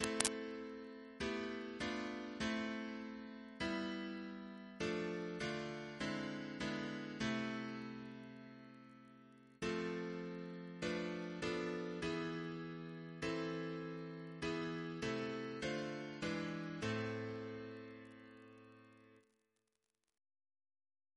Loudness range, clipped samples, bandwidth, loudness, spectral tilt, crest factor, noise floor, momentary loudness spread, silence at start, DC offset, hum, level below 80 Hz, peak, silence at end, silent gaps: 4 LU; under 0.1%; 11 kHz; -44 LUFS; -4.5 dB/octave; 36 dB; -89 dBFS; 14 LU; 0 s; under 0.1%; none; -70 dBFS; -8 dBFS; 2 s; none